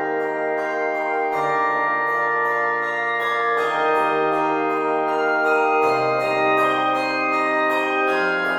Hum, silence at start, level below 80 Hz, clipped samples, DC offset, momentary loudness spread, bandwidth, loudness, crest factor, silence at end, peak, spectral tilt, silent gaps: none; 0 s; -72 dBFS; under 0.1%; under 0.1%; 4 LU; 17 kHz; -20 LUFS; 12 dB; 0 s; -8 dBFS; -4.5 dB/octave; none